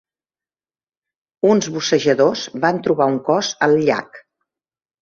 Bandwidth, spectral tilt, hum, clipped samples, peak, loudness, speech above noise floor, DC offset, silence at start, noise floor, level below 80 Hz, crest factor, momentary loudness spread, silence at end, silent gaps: 7.4 kHz; -4.5 dB/octave; none; under 0.1%; -2 dBFS; -17 LUFS; over 73 dB; under 0.1%; 1.45 s; under -90 dBFS; -62 dBFS; 18 dB; 4 LU; 0.85 s; none